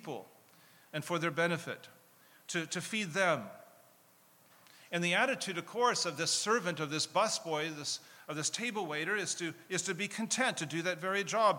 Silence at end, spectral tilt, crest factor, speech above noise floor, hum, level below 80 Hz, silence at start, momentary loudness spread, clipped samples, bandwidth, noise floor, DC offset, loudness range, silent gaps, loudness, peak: 0 s; -2.5 dB/octave; 20 dB; 30 dB; none; under -90 dBFS; 0 s; 10 LU; under 0.1%; 19 kHz; -65 dBFS; under 0.1%; 5 LU; none; -34 LUFS; -16 dBFS